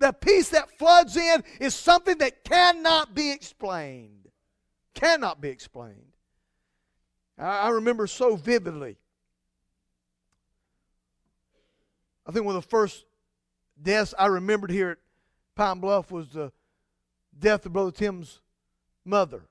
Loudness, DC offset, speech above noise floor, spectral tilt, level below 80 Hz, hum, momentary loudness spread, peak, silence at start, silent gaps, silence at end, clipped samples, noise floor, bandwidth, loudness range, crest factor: -23 LUFS; under 0.1%; 56 dB; -3.5 dB/octave; -54 dBFS; none; 18 LU; -4 dBFS; 0 s; none; 0.1 s; under 0.1%; -79 dBFS; 11 kHz; 12 LU; 22 dB